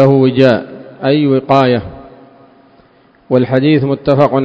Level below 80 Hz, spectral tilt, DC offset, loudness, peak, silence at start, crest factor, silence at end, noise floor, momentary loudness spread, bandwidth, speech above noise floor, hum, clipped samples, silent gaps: -46 dBFS; -9 dB/octave; under 0.1%; -12 LUFS; 0 dBFS; 0 s; 12 dB; 0 s; -47 dBFS; 9 LU; 7.8 kHz; 37 dB; none; 0.4%; none